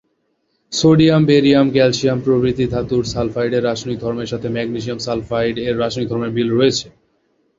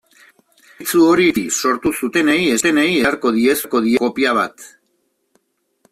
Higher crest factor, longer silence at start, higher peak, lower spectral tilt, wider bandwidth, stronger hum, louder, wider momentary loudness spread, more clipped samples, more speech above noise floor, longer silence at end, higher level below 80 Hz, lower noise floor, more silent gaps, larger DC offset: about the same, 16 dB vs 14 dB; about the same, 0.7 s vs 0.8 s; about the same, 0 dBFS vs -2 dBFS; first, -6 dB/octave vs -3.5 dB/octave; second, 7.8 kHz vs 16 kHz; neither; about the same, -17 LUFS vs -16 LUFS; first, 11 LU vs 6 LU; neither; about the same, 50 dB vs 51 dB; second, 0.7 s vs 1.25 s; first, -44 dBFS vs -54 dBFS; about the same, -66 dBFS vs -66 dBFS; neither; neither